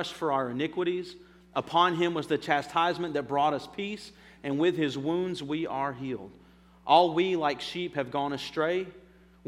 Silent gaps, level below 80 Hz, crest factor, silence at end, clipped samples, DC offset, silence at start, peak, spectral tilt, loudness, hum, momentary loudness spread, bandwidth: none; -64 dBFS; 22 dB; 0.45 s; under 0.1%; under 0.1%; 0 s; -8 dBFS; -5.5 dB/octave; -29 LUFS; none; 13 LU; 12.5 kHz